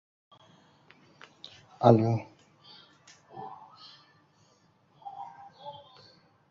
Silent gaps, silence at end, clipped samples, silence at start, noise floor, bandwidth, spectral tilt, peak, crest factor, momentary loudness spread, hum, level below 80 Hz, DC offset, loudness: none; 0.8 s; under 0.1%; 1.8 s; -65 dBFS; 7.2 kHz; -8.5 dB/octave; -4 dBFS; 30 dB; 29 LU; none; -70 dBFS; under 0.1%; -25 LUFS